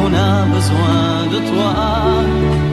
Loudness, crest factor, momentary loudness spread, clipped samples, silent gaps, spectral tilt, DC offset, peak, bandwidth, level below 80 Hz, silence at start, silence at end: -15 LUFS; 12 dB; 2 LU; under 0.1%; none; -6.5 dB/octave; under 0.1%; -2 dBFS; 13 kHz; -26 dBFS; 0 s; 0 s